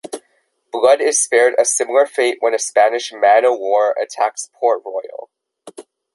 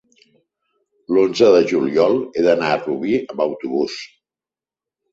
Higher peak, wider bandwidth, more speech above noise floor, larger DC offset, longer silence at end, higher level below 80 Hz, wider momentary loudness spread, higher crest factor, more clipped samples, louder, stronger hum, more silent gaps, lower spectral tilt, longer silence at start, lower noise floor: about the same, -2 dBFS vs -2 dBFS; first, 11.5 kHz vs 7.8 kHz; second, 48 dB vs over 73 dB; neither; second, 0.35 s vs 1.05 s; second, -72 dBFS vs -60 dBFS; first, 15 LU vs 10 LU; about the same, 16 dB vs 18 dB; neither; about the same, -15 LUFS vs -17 LUFS; neither; neither; second, 0 dB/octave vs -5.5 dB/octave; second, 0.1 s vs 1.1 s; second, -63 dBFS vs under -90 dBFS